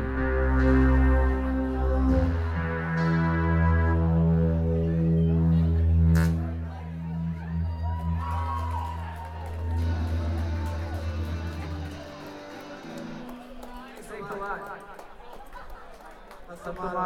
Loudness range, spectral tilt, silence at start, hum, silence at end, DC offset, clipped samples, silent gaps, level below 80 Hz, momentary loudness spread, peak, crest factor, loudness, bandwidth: 15 LU; -8.5 dB/octave; 0 s; none; 0 s; under 0.1%; under 0.1%; none; -30 dBFS; 20 LU; -12 dBFS; 14 dB; -26 LUFS; 8.6 kHz